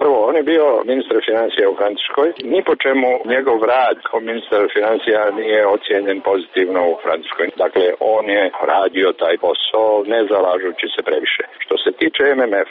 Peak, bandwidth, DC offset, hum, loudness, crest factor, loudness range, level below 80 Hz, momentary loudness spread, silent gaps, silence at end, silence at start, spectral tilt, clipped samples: -4 dBFS; 4.8 kHz; under 0.1%; none; -16 LUFS; 12 dB; 1 LU; -62 dBFS; 5 LU; none; 0 s; 0 s; 0 dB/octave; under 0.1%